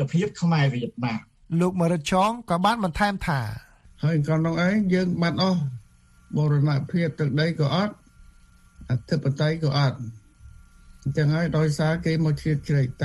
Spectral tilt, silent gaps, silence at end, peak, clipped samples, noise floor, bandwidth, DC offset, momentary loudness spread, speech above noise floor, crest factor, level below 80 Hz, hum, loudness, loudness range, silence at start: -7 dB/octave; none; 0 s; -6 dBFS; under 0.1%; -54 dBFS; 12 kHz; under 0.1%; 8 LU; 31 dB; 18 dB; -48 dBFS; none; -24 LUFS; 3 LU; 0 s